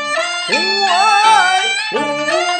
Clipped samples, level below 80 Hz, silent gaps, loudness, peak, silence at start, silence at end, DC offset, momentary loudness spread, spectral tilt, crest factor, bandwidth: under 0.1%; -66 dBFS; none; -13 LUFS; 0 dBFS; 0 s; 0 s; under 0.1%; 8 LU; -0.5 dB/octave; 14 dB; 10.5 kHz